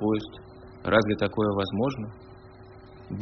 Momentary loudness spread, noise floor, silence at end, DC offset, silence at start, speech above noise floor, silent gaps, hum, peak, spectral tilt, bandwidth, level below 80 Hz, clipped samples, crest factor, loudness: 25 LU; -48 dBFS; 0 s; under 0.1%; 0 s; 21 dB; none; none; -6 dBFS; -5 dB/octave; 6.2 kHz; -54 dBFS; under 0.1%; 22 dB; -26 LUFS